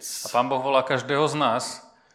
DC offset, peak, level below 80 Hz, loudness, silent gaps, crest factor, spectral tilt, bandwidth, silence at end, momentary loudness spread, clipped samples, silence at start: under 0.1%; -6 dBFS; -74 dBFS; -24 LUFS; none; 18 dB; -3.5 dB/octave; 16 kHz; 0.35 s; 8 LU; under 0.1%; 0 s